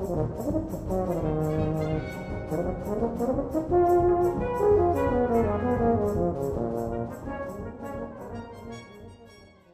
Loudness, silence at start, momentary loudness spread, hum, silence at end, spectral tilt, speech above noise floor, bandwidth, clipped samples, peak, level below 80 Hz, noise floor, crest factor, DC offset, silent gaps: -27 LUFS; 0 s; 16 LU; none; 0.25 s; -8.5 dB/octave; 26 dB; 15 kHz; under 0.1%; -12 dBFS; -42 dBFS; -52 dBFS; 16 dB; under 0.1%; none